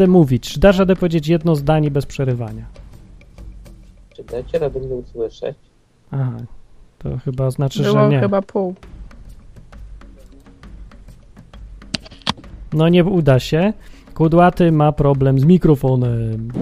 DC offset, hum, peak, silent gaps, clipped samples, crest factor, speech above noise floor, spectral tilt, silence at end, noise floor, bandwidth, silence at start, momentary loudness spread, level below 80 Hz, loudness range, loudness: under 0.1%; none; 0 dBFS; none; under 0.1%; 18 dB; 27 dB; -8 dB/octave; 0 s; -42 dBFS; 14.5 kHz; 0 s; 17 LU; -36 dBFS; 13 LU; -16 LUFS